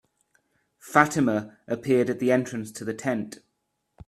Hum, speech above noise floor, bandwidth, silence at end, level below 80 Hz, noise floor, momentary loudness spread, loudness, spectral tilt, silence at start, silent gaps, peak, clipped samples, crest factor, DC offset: none; 53 dB; 14.5 kHz; 0.75 s; -64 dBFS; -77 dBFS; 12 LU; -25 LUFS; -5.5 dB/octave; 0.85 s; none; -2 dBFS; under 0.1%; 24 dB; under 0.1%